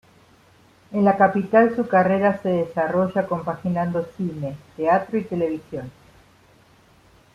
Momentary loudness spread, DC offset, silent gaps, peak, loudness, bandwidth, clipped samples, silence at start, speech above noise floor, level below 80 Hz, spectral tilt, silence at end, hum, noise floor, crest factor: 13 LU; under 0.1%; none; -2 dBFS; -21 LUFS; 10 kHz; under 0.1%; 0.9 s; 33 dB; -60 dBFS; -9 dB/octave; 1.45 s; none; -54 dBFS; 20 dB